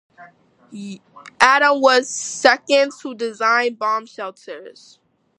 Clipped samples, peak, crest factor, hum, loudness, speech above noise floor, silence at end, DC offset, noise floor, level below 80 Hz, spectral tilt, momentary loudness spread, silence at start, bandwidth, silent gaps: under 0.1%; 0 dBFS; 20 dB; none; -17 LUFS; 29 dB; 0.65 s; under 0.1%; -47 dBFS; -64 dBFS; -1.5 dB/octave; 22 LU; 0.2 s; 11.5 kHz; none